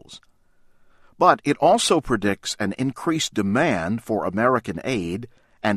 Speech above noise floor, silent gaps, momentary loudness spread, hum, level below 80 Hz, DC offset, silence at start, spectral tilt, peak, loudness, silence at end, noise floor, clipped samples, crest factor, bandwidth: 35 dB; none; 9 LU; none; -50 dBFS; under 0.1%; 0.1 s; -4.5 dB/octave; -2 dBFS; -22 LUFS; 0 s; -56 dBFS; under 0.1%; 22 dB; 14 kHz